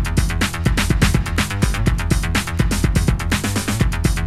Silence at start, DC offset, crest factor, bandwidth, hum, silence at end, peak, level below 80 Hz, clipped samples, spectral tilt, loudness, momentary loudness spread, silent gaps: 0 s; under 0.1%; 14 dB; 15.5 kHz; none; 0 s; -2 dBFS; -22 dBFS; under 0.1%; -5 dB/octave; -19 LUFS; 3 LU; none